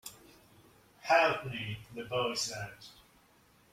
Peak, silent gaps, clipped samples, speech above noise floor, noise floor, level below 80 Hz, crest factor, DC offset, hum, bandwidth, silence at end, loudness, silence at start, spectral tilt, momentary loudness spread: -14 dBFS; none; under 0.1%; 32 dB; -65 dBFS; -68 dBFS; 22 dB; under 0.1%; none; 16.5 kHz; 0.8 s; -32 LUFS; 0.05 s; -3 dB/octave; 22 LU